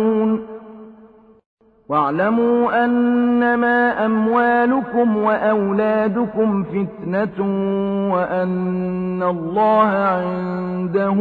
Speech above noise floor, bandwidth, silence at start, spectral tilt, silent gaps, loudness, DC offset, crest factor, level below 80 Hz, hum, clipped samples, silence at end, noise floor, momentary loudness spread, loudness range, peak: 29 dB; 4.7 kHz; 0 s; -10 dB/octave; 1.46-1.57 s; -18 LUFS; under 0.1%; 14 dB; -54 dBFS; none; under 0.1%; 0 s; -47 dBFS; 7 LU; 4 LU; -4 dBFS